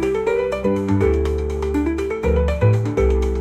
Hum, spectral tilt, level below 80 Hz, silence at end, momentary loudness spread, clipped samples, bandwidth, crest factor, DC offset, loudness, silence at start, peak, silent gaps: none; -8 dB/octave; -26 dBFS; 0 s; 5 LU; under 0.1%; 9.8 kHz; 14 dB; under 0.1%; -20 LUFS; 0 s; -4 dBFS; none